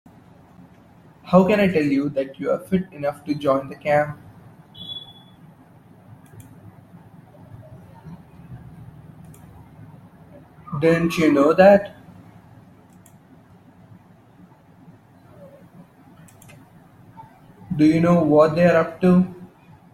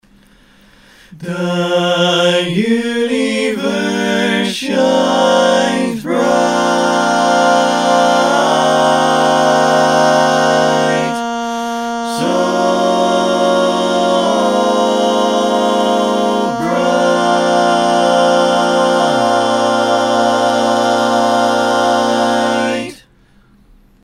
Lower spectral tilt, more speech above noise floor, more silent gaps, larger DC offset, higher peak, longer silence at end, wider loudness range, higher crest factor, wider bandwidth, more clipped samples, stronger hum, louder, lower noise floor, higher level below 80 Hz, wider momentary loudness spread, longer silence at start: first, -7.5 dB/octave vs -4 dB/octave; about the same, 32 dB vs 35 dB; neither; second, under 0.1% vs 0.1%; about the same, -2 dBFS vs 0 dBFS; second, 0.45 s vs 1.1 s; first, 24 LU vs 3 LU; first, 20 dB vs 14 dB; second, 13.5 kHz vs 16 kHz; neither; neither; second, -19 LUFS vs -13 LUFS; about the same, -50 dBFS vs -49 dBFS; about the same, -56 dBFS vs -54 dBFS; first, 27 LU vs 5 LU; first, 1.25 s vs 1.1 s